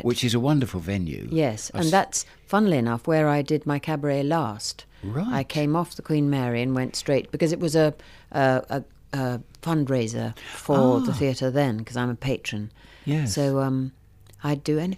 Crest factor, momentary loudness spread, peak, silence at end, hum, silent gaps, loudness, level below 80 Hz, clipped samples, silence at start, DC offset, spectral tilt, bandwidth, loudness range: 16 dB; 11 LU; -8 dBFS; 0 s; none; none; -25 LUFS; -52 dBFS; under 0.1%; 0.05 s; under 0.1%; -6 dB/octave; 15.5 kHz; 2 LU